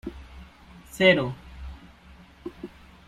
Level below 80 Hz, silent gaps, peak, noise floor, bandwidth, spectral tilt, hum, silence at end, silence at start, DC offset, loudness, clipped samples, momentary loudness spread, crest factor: -48 dBFS; none; -4 dBFS; -51 dBFS; 14.5 kHz; -5.5 dB/octave; none; 0.4 s; 0.05 s; under 0.1%; -22 LUFS; under 0.1%; 25 LU; 24 dB